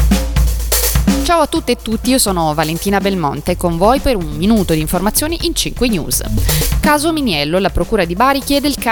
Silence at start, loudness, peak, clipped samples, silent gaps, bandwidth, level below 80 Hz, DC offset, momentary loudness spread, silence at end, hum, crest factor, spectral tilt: 0 s; -14 LUFS; 0 dBFS; under 0.1%; none; 19.5 kHz; -22 dBFS; under 0.1%; 4 LU; 0 s; none; 14 dB; -4.5 dB/octave